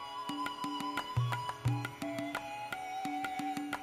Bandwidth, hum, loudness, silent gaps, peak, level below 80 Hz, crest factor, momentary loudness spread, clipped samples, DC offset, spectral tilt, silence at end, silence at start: 16 kHz; none; -38 LUFS; none; -20 dBFS; -62 dBFS; 18 dB; 5 LU; under 0.1%; under 0.1%; -5.5 dB/octave; 0 s; 0 s